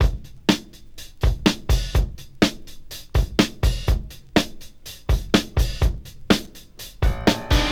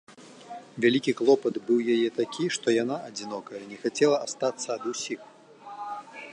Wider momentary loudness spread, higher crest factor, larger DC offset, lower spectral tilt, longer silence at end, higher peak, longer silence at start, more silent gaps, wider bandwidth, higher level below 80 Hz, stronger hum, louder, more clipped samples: about the same, 18 LU vs 16 LU; about the same, 20 dB vs 18 dB; first, 0.1% vs under 0.1%; about the same, -5 dB/octave vs -4 dB/octave; about the same, 0 s vs 0 s; first, -2 dBFS vs -8 dBFS; about the same, 0 s vs 0.1 s; neither; first, 18.5 kHz vs 10.5 kHz; first, -26 dBFS vs -80 dBFS; neither; first, -23 LUFS vs -27 LUFS; neither